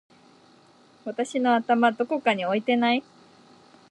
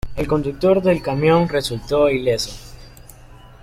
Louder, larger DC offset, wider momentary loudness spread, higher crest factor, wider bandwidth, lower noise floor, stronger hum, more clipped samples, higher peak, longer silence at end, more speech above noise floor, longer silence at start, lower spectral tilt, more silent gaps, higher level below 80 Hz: second, -24 LUFS vs -18 LUFS; neither; about the same, 9 LU vs 7 LU; about the same, 20 dB vs 16 dB; second, 10.5 kHz vs 16 kHz; first, -56 dBFS vs -42 dBFS; neither; neither; about the same, -6 dBFS vs -4 dBFS; first, 0.9 s vs 0.15 s; first, 33 dB vs 25 dB; first, 1.05 s vs 0.05 s; about the same, -5 dB/octave vs -6 dB/octave; neither; second, -78 dBFS vs -38 dBFS